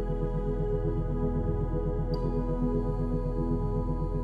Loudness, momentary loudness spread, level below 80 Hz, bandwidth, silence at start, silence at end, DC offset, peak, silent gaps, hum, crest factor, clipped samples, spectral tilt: -31 LUFS; 2 LU; -32 dBFS; 5 kHz; 0 s; 0 s; under 0.1%; -16 dBFS; none; none; 12 dB; under 0.1%; -10.5 dB/octave